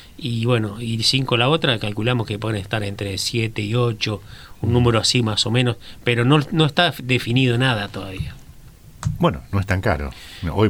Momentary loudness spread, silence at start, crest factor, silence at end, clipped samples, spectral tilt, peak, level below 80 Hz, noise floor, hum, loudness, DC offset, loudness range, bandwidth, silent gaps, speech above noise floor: 11 LU; 0 s; 18 dB; 0 s; under 0.1%; -5 dB/octave; -2 dBFS; -40 dBFS; -43 dBFS; none; -20 LUFS; under 0.1%; 4 LU; 15.5 kHz; none; 23 dB